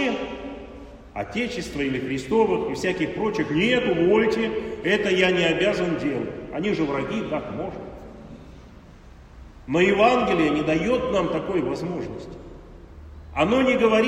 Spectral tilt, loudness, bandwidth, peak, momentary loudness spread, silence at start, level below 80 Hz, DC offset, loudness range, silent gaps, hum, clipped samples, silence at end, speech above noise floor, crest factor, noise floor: -5.5 dB/octave; -23 LUFS; 10.5 kHz; -4 dBFS; 20 LU; 0 s; -46 dBFS; under 0.1%; 7 LU; none; none; under 0.1%; 0 s; 23 dB; 18 dB; -46 dBFS